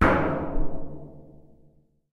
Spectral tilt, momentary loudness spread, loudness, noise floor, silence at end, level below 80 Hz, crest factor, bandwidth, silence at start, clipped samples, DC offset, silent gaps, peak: -8 dB/octave; 23 LU; -28 LUFS; -59 dBFS; 0.9 s; -34 dBFS; 20 dB; 6.6 kHz; 0 s; under 0.1%; under 0.1%; none; -6 dBFS